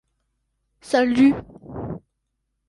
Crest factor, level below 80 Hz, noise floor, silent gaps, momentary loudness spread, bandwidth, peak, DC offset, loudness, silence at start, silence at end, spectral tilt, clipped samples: 18 dB; -52 dBFS; -76 dBFS; none; 20 LU; 11.5 kHz; -6 dBFS; under 0.1%; -19 LUFS; 0.85 s; 0.7 s; -6 dB/octave; under 0.1%